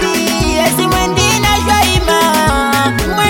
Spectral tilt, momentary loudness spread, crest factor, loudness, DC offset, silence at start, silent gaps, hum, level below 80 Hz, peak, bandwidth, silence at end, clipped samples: -3.5 dB/octave; 3 LU; 12 dB; -11 LUFS; under 0.1%; 0 s; none; none; -24 dBFS; 0 dBFS; 17 kHz; 0 s; under 0.1%